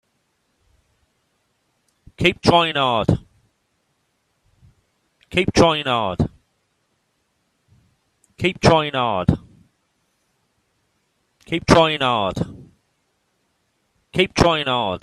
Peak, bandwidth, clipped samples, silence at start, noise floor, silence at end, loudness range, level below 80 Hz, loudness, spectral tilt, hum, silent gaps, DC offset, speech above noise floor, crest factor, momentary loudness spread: 0 dBFS; 13.5 kHz; under 0.1%; 2.2 s; -69 dBFS; 0.05 s; 1 LU; -42 dBFS; -19 LUFS; -5 dB/octave; none; none; under 0.1%; 51 dB; 22 dB; 10 LU